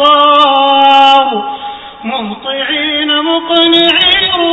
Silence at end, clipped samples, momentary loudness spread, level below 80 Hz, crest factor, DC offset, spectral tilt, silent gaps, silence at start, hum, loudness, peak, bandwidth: 0 s; 0.6%; 14 LU; -46 dBFS; 10 dB; under 0.1%; -4 dB/octave; none; 0 s; none; -8 LUFS; 0 dBFS; 8 kHz